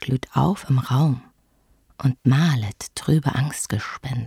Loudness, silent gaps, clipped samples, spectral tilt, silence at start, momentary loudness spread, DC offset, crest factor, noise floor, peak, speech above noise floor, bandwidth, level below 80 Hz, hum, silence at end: -22 LUFS; none; under 0.1%; -6 dB/octave; 0 s; 9 LU; under 0.1%; 16 dB; -61 dBFS; -6 dBFS; 40 dB; 15 kHz; -50 dBFS; none; 0 s